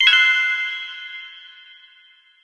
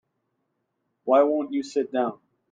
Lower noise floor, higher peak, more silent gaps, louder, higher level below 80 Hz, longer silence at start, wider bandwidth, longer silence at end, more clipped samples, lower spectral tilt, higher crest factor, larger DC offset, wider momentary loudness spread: second, -53 dBFS vs -77 dBFS; first, 0 dBFS vs -8 dBFS; neither; first, -17 LUFS vs -24 LUFS; second, under -90 dBFS vs -80 dBFS; second, 0 s vs 1.05 s; first, 11 kHz vs 9.2 kHz; first, 0.95 s vs 0.4 s; neither; second, 10 dB/octave vs -5.5 dB/octave; about the same, 20 dB vs 18 dB; neither; first, 24 LU vs 9 LU